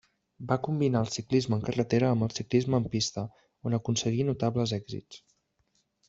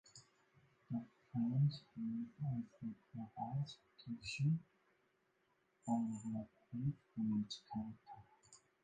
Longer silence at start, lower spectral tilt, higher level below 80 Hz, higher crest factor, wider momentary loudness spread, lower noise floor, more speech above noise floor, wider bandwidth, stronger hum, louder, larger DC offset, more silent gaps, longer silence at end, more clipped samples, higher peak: first, 0.4 s vs 0.05 s; about the same, -6 dB/octave vs -7 dB/octave; first, -60 dBFS vs -76 dBFS; about the same, 18 dB vs 16 dB; about the same, 12 LU vs 13 LU; second, -74 dBFS vs -80 dBFS; first, 45 dB vs 38 dB; second, 8 kHz vs 9.4 kHz; neither; first, -29 LUFS vs -44 LUFS; neither; neither; first, 0.9 s vs 0.3 s; neither; first, -10 dBFS vs -28 dBFS